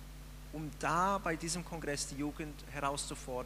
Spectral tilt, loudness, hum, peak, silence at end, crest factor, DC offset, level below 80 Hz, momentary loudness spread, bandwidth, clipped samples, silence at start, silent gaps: -4 dB/octave; -37 LUFS; none; -20 dBFS; 0 s; 18 dB; under 0.1%; -50 dBFS; 13 LU; 15.5 kHz; under 0.1%; 0 s; none